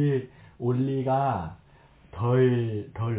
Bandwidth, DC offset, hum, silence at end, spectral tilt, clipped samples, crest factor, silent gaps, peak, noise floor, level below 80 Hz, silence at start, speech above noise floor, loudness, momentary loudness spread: 4 kHz; under 0.1%; none; 0 s; -12.5 dB/octave; under 0.1%; 14 dB; none; -12 dBFS; -55 dBFS; -52 dBFS; 0 s; 30 dB; -26 LUFS; 15 LU